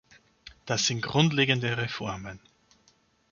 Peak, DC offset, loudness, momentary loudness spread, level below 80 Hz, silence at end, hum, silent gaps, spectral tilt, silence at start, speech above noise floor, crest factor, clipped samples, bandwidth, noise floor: -6 dBFS; under 0.1%; -26 LUFS; 17 LU; -60 dBFS; 0.95 s; none; none; -4 dB/octave; 0.45 s; 38 dB; 24 dB; under 0.1%; 7.2 kHz; -66 dBFS